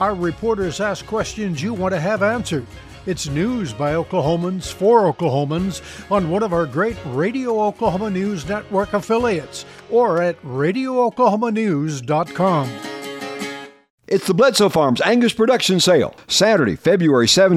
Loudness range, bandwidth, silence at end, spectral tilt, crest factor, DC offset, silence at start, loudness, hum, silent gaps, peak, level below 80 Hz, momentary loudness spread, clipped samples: 6 LU; 15.5 kHz; 0 s; -5 dB/octave; 16 dB; under 0.1%; 0 s; -18 LUFS; none; 13.90-13.98 s; -2 dBFS; -46 dBFS; 11 LU; under 0.1%